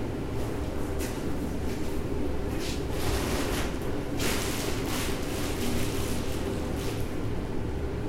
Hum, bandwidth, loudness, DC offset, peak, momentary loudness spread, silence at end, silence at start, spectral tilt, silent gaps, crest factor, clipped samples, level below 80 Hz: none; 16 kHz; -31 LUFS; under 0.1%; -14 dBFS; 4 LU; 0 s; 0 s; -5 dB/octave; none; 16 dB; under 0.1%; -36 dBFS